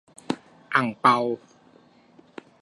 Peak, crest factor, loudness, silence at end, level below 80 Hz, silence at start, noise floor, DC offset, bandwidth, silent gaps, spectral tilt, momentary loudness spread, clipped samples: -4 dBFS; 24 dB; -24 LUFS; 1.25 s; -74 dBFS; 0.3 s; -56 dBFS; under 0.1%; 11.5 kHz; none; -5.5 dB/octave; 26 LU; under 0.1%